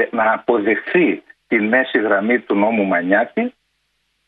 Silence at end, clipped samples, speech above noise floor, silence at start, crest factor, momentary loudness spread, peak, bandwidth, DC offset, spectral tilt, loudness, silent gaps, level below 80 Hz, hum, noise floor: 0.75 s; under 0.1%; 51 dB; 0 s; 16 dB; 6 LU; -2 dBFS; 4.4 kHz; under 0.1%; -9 dB/octave; -17 LUFS; none; -64 dBFS; none; -68 dBFS